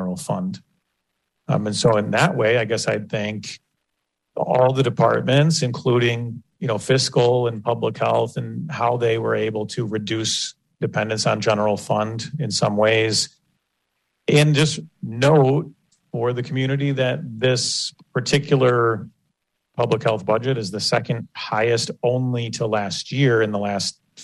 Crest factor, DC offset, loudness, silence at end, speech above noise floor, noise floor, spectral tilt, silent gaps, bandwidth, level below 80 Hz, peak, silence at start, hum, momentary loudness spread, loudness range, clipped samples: 16 dB; under 0.1%; -21 LUFS; 0 s; 57 dB; -77 dBFS; -5 dB/octave; none; 12 kHz; -58 dBFS; -4 dBFS; 0 s; none; 11 LU; 3 LU; under 0.1%